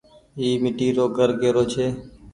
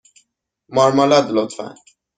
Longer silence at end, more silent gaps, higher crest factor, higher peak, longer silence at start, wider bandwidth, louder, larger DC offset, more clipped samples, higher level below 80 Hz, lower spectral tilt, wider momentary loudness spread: second, 0.05 s vs 0.45 s; neither; about the same, 16 dB vs 16 dB; second, -6 dBFS vs -2 dBFS; second, 0.35 s vs 0.7 s; first, 11 kHz vs 9.4 kHz; second, -22 LUFS vs -16 LUFS; neither; neither; first, -52 dBFS vs -60 dBFS; about the same, -6 dB/octave vs -5 dB/octave; second, 8 LU vs 17 LU